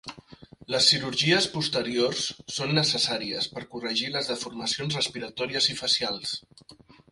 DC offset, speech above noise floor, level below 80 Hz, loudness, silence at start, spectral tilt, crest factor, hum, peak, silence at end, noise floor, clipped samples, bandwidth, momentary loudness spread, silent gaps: under 0.1%; 22 dB; -62 dBFS; -25 LUFS; 0.05 s; -3 dB/octave; 22 dB; none; -6 dBFS; 0.35 s; -50 dBFS; under 0.1%; 11.5 kHz; 10 LU; none